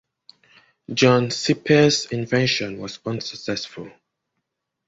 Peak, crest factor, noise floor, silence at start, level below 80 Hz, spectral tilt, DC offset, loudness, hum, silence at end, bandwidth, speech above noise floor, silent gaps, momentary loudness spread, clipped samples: -2 dBFS; 20 dB; -79 dBFS; 0.9 s; -58 dBFS; -4.5 dB/octave; under 0.1%; -21 LUFS; none; 1 s; 8 kHz; 58 dB; none; 15 LU; under 0.1%